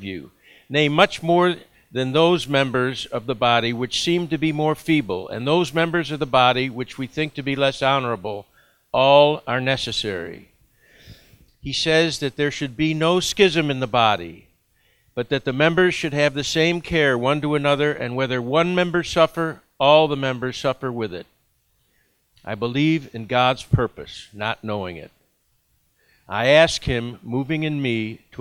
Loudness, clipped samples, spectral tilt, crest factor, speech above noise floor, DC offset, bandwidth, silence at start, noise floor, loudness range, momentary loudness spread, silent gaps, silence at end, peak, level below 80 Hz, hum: -20 LUFS; under 0.1%; -5 dB/octave; 22 dB; 45 dB; under 0.1%; 16 kHz; 0 s; -66 dBFS; 4 LU; 13 LU; none; 0.25 s; 0 dBFS; -48 dBFS; none